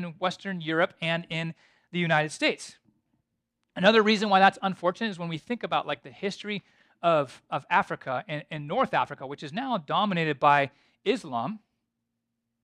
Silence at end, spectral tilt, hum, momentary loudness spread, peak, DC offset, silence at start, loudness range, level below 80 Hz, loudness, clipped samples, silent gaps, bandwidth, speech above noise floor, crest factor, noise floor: 1.05 s; -5 dB/octave; none; 14 LU; -6 dBFS; under 0.1%; 0 s; 4 LU; -72 dBFS; -27 LUFS; under 0.1%; none; 11 kHz; 55 dB; 22 dB; -82 dBFS